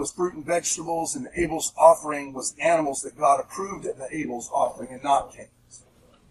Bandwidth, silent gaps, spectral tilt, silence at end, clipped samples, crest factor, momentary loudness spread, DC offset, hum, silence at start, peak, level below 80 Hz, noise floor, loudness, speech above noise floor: 14 kHz; none; -3.5 dB/octave; 0.55 s; under 0.1%; 22 dB; 14 LU; under 0.1%; none; 0 s; -2 dBFS; -54 dBFS; -57 dBFS; -24 LUFS; 32 dB